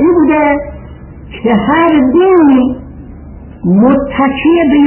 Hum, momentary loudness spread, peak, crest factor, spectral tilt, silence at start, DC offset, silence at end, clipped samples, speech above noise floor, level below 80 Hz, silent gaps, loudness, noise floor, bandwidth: none; 18 LU; 0 dBFS; 10 dB; -11.5 dB/octave; 0 s; under 0.1%; 0 s; under 0.1%; 22 dB; -34 dBFS; none; -9 LUFS; -30 dBFS; 3.2 kHz